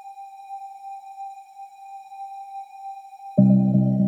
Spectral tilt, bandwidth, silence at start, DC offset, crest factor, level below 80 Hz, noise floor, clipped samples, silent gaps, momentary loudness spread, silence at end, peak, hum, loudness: -11.5 dB/octave; 4.1 kHz; 0.05 s; under 0.1%; 20 dB; -62 dBFS; -42 dBFS; under 0.1%; none; 24 LU; 0 s; -6 dBFS; none; -19 LUFS